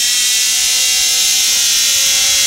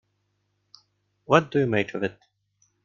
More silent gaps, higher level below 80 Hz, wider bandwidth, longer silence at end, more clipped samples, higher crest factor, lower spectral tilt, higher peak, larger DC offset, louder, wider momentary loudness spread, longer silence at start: neither; first, -48 dBFS vs -64 dBFS; first, 17.5 kHz vs 7.2 kHz; second, 0 s vs 0.75 s; neither; second, 12 dB vs 24 dB; second, 3.5 dB/octave vs -6.5 dB/octave; about the same, 0 dBFS vs -2 dBFS; first, 0.1% vs under 0.1%; first, -10 LUFS vs -24 LUFS; second, 1 LU vs 11 LU; second, 0 s vs 1.3 s